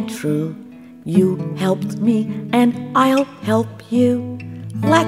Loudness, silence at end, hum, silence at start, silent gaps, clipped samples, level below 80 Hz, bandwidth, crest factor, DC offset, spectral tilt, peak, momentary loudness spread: -18 LUFS; 0 s; none; 0 s; none; under 0.1%; -62 dBFS; 15.5 kHz; 18 dB; under 0.1%; -6.5 dB/octave; 0 dBFS; 12 LU